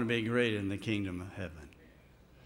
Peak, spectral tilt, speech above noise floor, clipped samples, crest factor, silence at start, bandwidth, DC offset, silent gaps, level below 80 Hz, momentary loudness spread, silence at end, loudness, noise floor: -16 dBFS; -6 dB/octave; 26 dB; under 0.1%; 18 dB; 0 s; 16 kHz; under 0.1%; none; -62 dBFS; 18 LU; 0.55 s; -34 LUFS; -60 dBFS